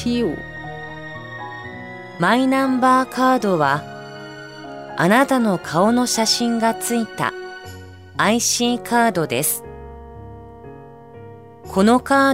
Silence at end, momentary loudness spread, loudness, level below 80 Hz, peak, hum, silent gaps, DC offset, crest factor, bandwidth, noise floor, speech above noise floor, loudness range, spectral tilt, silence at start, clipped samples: 0 s; 22 LU; -18 LUFS; -50 dBFS; -4 dBFS; none; none; 0.2%; 16 dB; 16 kHz; -40 dBFS; 22 dB; 3 LU; -4 dB/octave; 0 s; under 0.1%